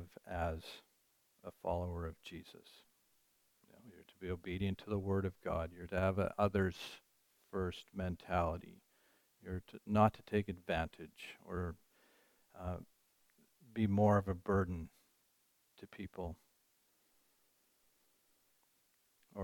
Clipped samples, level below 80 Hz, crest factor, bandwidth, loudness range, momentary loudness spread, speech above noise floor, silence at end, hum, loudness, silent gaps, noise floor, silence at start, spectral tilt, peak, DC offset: under 0.1%; -58 dBFS; 24 dB; 18.5 kHz; 11 LU; 21 LU; 38 dB; 0 s; none; -39 LUFS; none; -77 dBFS; 0 s; -7.5 dB/octave; -18 dBFS; under 0.1%